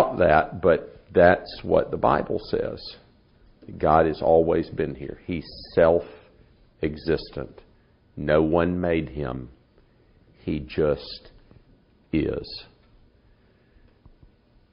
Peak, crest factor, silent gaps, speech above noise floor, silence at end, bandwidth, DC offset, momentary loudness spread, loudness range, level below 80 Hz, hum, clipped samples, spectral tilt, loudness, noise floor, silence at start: -2 dBFS; 24 dB; none; 36 dB; 2.1 s; 5.4 kHz; under 0.1%; 18 LU; 8 LU; -44 dBFS; none; under 0.1%; -5.5 dB/octave; -23 LUFS; -59 dBFS; 0 s